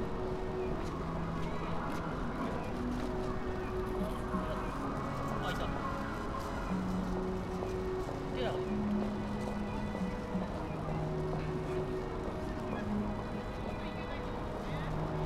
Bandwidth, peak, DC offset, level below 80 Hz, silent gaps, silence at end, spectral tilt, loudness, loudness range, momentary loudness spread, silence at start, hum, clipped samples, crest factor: 15.5 kHz; -22 dBFS; under 0.1%; -44 dBFS; none; 0 s; -7 dB/octave; -37 LUFS; 1 LU; 3 LU; 0 s; none; under 0.1%; 14 dB